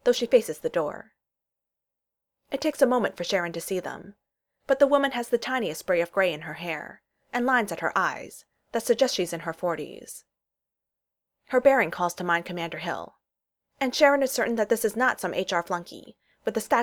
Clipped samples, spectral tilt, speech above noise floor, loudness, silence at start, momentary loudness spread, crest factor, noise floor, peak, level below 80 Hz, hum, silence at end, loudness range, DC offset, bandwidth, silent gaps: under 0.1%; -3.5 dB/octave; 61 dB; -26 LUFS; 0.05 s; 15 LU; 22 dB; -87 dBFS; -6 dBFS; -68 dBFS; none; 0 s; 4 LU; under 0.1%; 19.5 kHz; none